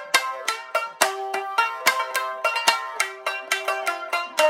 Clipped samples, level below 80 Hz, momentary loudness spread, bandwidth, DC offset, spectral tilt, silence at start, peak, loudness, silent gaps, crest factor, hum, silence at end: under 0.1%; -74 dBFS; 6 LU; 16.5 kHz; under 0.1%; 1.5 dB/octave; 0 s; 0 dBFS; -24 LUFS; none; 24 dB; none; 0 s